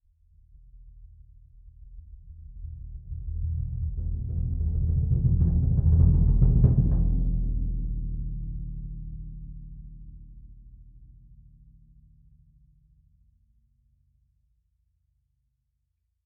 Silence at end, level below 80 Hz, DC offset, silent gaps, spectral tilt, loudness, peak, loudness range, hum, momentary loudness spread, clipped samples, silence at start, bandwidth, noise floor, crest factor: 5.2 s; -30 dBFS; under 0.1%; none; -16 dB/octave; -26 LUFS; -6 dBFS; 22 LU; none; 26 LU; under 0.1%; 0.75 s; 1.3 kHz; -77 dBFS; 22 dB